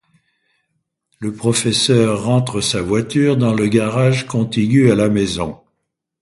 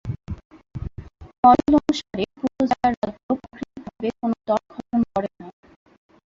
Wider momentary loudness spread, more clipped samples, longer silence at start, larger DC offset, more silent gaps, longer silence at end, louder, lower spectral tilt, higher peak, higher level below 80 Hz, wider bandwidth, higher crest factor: second, 7 LU vs 20 LU; neither; first, 1.2 s vs 0.05 s; neither; second, none vs 0.45-0.50 s, 1.38-1.43 s, 2.97-3.02 s, 3.23-3.29 s; second, 0.65 s vs 0.8 s; first, -16 LUFS vs -22 LUFS; about the same, -5.5 dB/octave vs -6.5 dB/octave; about the same, 0 dBFS vs -2 dBFS; about the same, -46 dBFS vs -44 dBFS; first, 11.5 kHz vs 7.8 kHz; about the same, 16 dB vs 20 dB